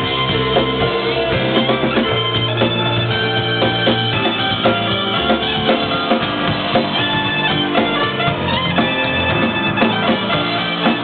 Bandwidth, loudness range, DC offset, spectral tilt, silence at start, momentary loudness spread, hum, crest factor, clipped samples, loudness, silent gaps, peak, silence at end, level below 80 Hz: 4.8 kHz; 0 LU; under 0.1%; -9.5 dB/octave; 0 s; 2 LU; none; 16 dB; under 0.1%; -16 LUFS; none; 0 dBFS; 0 s; -40 dBFS